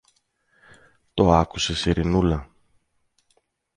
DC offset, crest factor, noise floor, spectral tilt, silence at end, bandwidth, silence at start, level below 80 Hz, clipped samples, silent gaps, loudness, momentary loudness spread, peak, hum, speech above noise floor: under 0.1%; 22 dB; -69 dBFS; -5.5 dB/octave; 1.35 s; 10 kHz; 1.15 s; -36 dBFS; under 0.1%; none; -22 LUFS; 9 LU; -2 dBFS; none; 49 dB